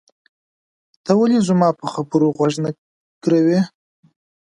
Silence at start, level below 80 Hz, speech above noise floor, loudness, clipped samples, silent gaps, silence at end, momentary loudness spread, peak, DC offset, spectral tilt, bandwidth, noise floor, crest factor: 1.05 s; -64 dBFS; over 74 dB; -18 LUFS; under 0.1%; 2.78-3.21 s; 0.8 s; 11 LU; -2 dBFS; under 0.1%; -7 dB/octave; 11 kHz; under -90 dBFS; 16 dB